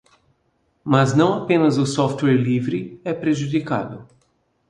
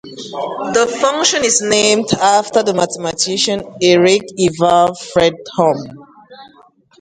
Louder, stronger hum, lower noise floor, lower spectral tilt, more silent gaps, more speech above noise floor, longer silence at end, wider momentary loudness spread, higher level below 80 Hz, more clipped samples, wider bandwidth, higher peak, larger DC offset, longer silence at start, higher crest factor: second, -20 LUFS vs -14 LUFS; neither; first, -66 dBFS vs -48 dBFS; first, -6.5 dB/octave vs -3 dB/octave; neither; first, 47 dB vs 34 dB; about the same, 0.65 s vs 0.55 s; first, 11 LU vs 8 LU; second, -58 dBFS vs -52 dBFS; neither; about the same, 10.5 kHz vs 11 kHz; about the same, 0 dBFS vs 0 dBFS; neither; first, 0.85 s vs 0.05 s; first, 20 dB vs 14 dB